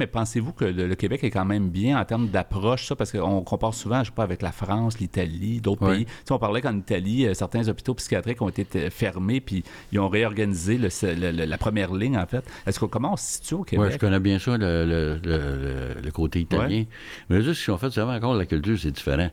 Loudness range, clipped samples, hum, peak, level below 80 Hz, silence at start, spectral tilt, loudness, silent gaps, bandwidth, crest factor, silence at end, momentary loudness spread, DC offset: 1 LU; under 0.1%; none; -10 dBFS; -40 dBFS; 0 s; -6 dB/octave; -25 LUFS; none; 16 kHz; 14 dB; 0 s; 5 LU; under 0.1%